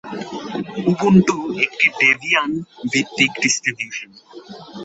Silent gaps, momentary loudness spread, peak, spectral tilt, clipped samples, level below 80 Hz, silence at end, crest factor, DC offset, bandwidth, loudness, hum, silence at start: none; 16 LU; -2 dBFS; -4 dB/octave; under 0.1%; -56 dBFS; 0 s; 18 dB; under 0.1%; 8 kHz; -17 LUFS; none; 0.05 s